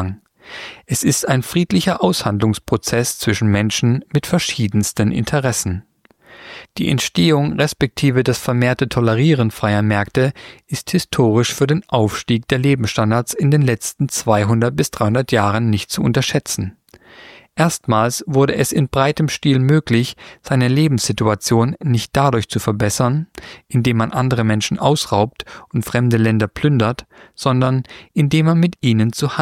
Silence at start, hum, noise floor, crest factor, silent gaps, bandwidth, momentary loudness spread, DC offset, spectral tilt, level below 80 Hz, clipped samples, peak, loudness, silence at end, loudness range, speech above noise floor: 0 s; none; -43 dBFS; 16 dB; none; 16 kHz; 8 LU; under 0.1%; -5.5 dB/octave; -44 dBFS; under 0.1%; -2 dBFS; -17 LUFS; 0 s; 2 LU; 27 dB